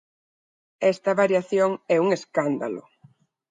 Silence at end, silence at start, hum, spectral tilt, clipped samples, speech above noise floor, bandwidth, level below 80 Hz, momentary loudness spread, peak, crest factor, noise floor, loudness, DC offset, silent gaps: 0.7 s; 0.8 s; none; -6 dB/octave; under 0.1%; 35 dB; 9.2 kHz; -76 dBFS; 7 LU; -6 dBFS; 18 dB; -57 dBFS; -23 LUFS; under 0.1%; none